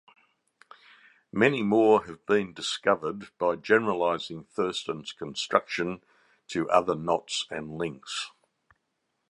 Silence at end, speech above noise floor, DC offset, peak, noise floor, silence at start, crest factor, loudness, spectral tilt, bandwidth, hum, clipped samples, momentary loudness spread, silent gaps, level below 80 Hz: 1.05 s; 52 dB; under 0.1%; -4 dBFS; -79 dBFS; 1.35 s; 24 dB; -27 LUFS; -4.5 dB/octave; 11 kHz; none; under 0.1%; 13 LU; none; -66 dBFS